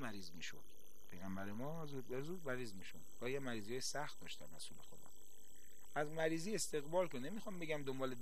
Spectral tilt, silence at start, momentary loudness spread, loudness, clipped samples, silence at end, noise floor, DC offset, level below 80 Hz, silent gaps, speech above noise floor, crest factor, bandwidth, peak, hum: -4 dB/octave; 0 s; 21 LU; -45 LUFS; under 0.1%; 0 s; -66 dBFS; 0.6%; -72 dBFS; none; 20 dB; 20 dB; 13.5 kHz; -26 dBFS; none